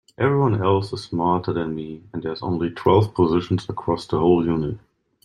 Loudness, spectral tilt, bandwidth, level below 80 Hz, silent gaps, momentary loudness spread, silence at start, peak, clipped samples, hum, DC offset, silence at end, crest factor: -22 LUFS; -8 dB/octave; 10.5 kHz; -50 dBFS; none; 12 LU; 0.2 s; -2 dBFS; under 0.1%; none; under 0.1%; 0.5 s; 18 dB